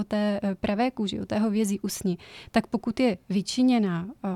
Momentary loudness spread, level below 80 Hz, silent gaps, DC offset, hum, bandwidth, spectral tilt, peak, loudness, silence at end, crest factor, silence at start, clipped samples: 7 LU; -56 dBFS; none; under 0.1%; none; 15 kHz; -5.5 dB/octave; -6 dBFS; -27 LUFS; 0 s; 20 dB; 0 s; under 0.1%